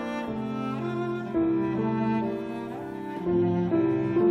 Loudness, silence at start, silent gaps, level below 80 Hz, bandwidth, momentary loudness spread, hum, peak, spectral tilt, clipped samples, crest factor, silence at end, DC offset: -28 LUFS; 0 s; none; -56 dBFS; 6.4 kHz; 10 LU; none; -14 dBFS; -9 dB/octave; under 0.1%; 14 dB; 0 s; under 0.1%